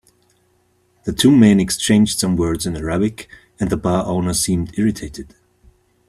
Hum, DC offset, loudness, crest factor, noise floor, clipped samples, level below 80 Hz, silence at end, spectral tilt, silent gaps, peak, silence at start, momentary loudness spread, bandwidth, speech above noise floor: 60 Hz at -40 dBFS; under 0.1%; -17 LUFS; 18 dB; -60 dBFS; under 0.1%; -42 dBFS; 0.85 s; -5 dB/octave; none; 0 dBFS; 1.05 s; 17 LU; 14 kHz; 44 dB